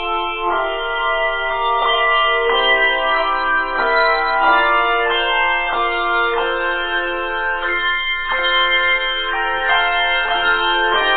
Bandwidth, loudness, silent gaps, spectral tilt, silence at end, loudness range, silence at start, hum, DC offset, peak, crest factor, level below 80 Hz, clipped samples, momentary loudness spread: 4.7 kHz; -16 LUFS; none; -5.5 dB/octave; 0 s; 3 LU; 0 s; none; under 0.1%; -2 dBFS; 16 dB; -36 dBFS; under 0.1%; 6 LU